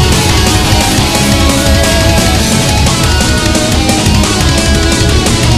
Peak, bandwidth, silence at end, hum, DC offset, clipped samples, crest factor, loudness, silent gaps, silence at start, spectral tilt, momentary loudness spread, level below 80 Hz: 0 dBFS; 16 kHz; 0 s; none; under 0.1%; 0.3%; 8 dB; -9 LUFS; none; 0 s; -4 dB/octave; 1 LU; -14 dBFS